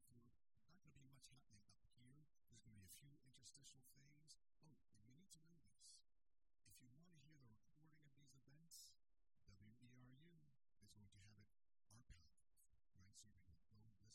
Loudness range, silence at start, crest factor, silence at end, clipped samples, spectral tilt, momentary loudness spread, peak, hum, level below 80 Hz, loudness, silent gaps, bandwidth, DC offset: 0 LU; 0 s; 22 dB; 0 s; under 0.1%; -3 dB/octave; 5 LU; -50 dBFS; none; -84 dBFS; -67 LUFS; none; 12.5 kHz; under 0.1%